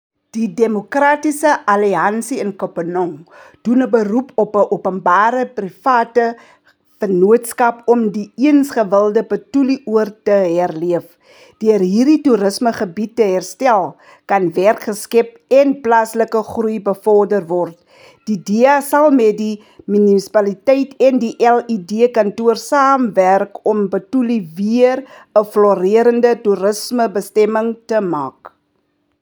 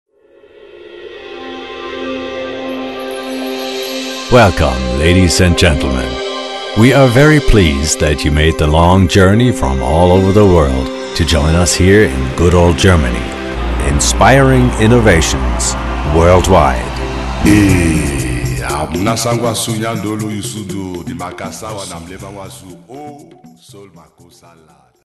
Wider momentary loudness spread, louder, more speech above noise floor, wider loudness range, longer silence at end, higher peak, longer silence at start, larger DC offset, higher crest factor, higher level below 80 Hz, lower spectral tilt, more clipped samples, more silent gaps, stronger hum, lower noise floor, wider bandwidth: second, 9 LU vs 16 LU; second, -15 LUFS vs -12 LUFS; first, 50 dB vs 34 dB; second, 2 LU vs 14 LU; second, 0.75 s vs 1.2 s; about the same, 0 dBFS vs 0 dBFS; second, 0.35 s vs 0.75 s; neither; about the same, 14 dB vs 12 dB; second, -68 dBFS vs -22 dBFS; about the same, -6 dB/octave vs -5 dB/octave; second, under 0.1% vs 0.1%; neither; neither; first, -64 dBFS vs -45 dBFS; first, over 20 kHz vs 12.5 kHz